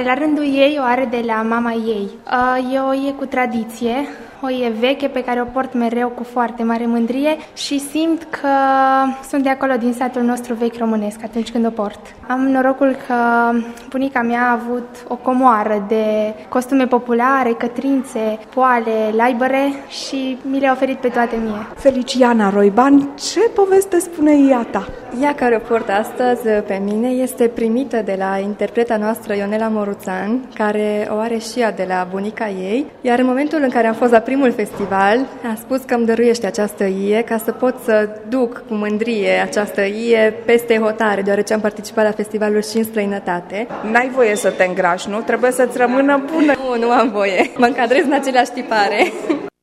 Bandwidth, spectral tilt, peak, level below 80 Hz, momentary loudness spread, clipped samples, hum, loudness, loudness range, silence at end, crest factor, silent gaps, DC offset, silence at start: 15 kHz; -5 dB/octave; 0 dBFS; -52 dBFS; 8 LU; under 0.1%; none; -17 LUFS; 4 LU; 0.15 s; 16 dB; none; under 0.1%; 0 s